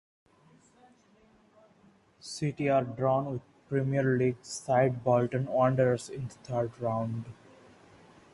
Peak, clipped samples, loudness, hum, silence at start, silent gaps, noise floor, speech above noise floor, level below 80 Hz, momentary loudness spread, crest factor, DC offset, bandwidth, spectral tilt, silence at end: -12 dBFS; under 0.1%; -30 LUFS; none; 2.25 s; none; -63 dBFS; 34 dB; -64 dBFS; 14 LU; 18 dB; under 0.1%; 11.5 kHz; -7 dB/octave; 1 s